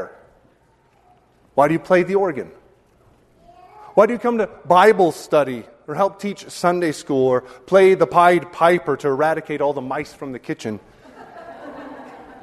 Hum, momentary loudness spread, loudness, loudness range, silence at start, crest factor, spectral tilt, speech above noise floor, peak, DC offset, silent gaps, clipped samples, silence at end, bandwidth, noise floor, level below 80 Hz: none; 22 LU; -18 LUFS; 6 LU; 0 s; 20 dB; -6 dB/octave; 40 dB; 0 dBFS; under 0.1%; none; under 0.1%; 0.1 s; 13.5 kHz; -57 dBFS; -60 dBFS